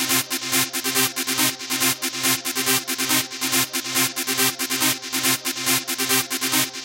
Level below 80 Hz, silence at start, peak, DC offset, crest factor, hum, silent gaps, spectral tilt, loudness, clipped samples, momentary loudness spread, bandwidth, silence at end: -66 dBFS; 0 s; -4 dBFS; under 0.1%; 18 dB; none; none; -1 dB/octave; -20 LUFS; under 0.1%; 1 LU; 17 kHz; 0 s